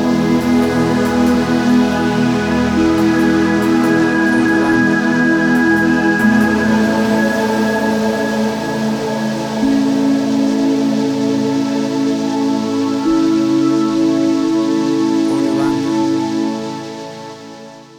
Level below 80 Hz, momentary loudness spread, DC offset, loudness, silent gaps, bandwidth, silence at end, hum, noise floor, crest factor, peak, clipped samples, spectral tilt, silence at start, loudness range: -42 dBFS; 6 LU; under 0.1%; -14 LUFS; none; 17 kHz; 0 s; none; -35 dBFS; 12 dB; -2 dBFS; under 0.1%; -5.5 dB/octave; 0 s; 3 LU